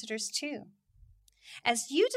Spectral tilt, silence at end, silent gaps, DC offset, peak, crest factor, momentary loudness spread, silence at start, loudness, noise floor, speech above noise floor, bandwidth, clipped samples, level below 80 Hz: -1.5 dB/octave; 0 s; none; under 0.1%; -10 dBFS; 24 dB; 15 LU; 0 s; -32 LUFS; -61 dBFS; 29 dB; 16 kHz; under 0.1%; -68 dBFS